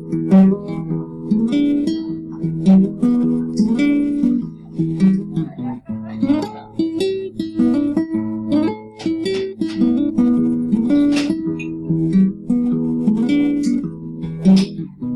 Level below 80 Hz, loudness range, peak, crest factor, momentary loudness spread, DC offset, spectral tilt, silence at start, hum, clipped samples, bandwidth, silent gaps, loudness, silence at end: -48 dBFS; 3 LU; -4 dBFS; 12 dB; 11 LU; under 0.1%; -8 dB/octave; 0 s; none; under 0.1%; 10.5 kHz; none; -18 LUFS; 0 s